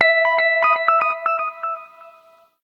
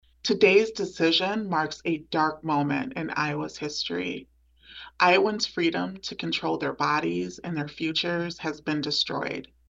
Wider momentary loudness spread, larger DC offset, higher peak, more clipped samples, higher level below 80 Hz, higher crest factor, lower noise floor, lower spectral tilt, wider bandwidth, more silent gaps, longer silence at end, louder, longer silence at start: about the same, 13 LU vs 12 LU; neither; first, 0 dBFS vs -6 dBFS; neither; second, -78 dBFS vs -62 dBFS; about the same, 20 dB vs 20 dB; about the same, -52 dBFS vs -49 dBFS; second, -2 dB/octave vs -4.5 dB/octave; second, 6.2 kHz vs 8 kHz; neither; first, 0.55 s vs 0.25 s; first, -18 LUFS vs -26 LUFS; second, 0 s vs 0.25 s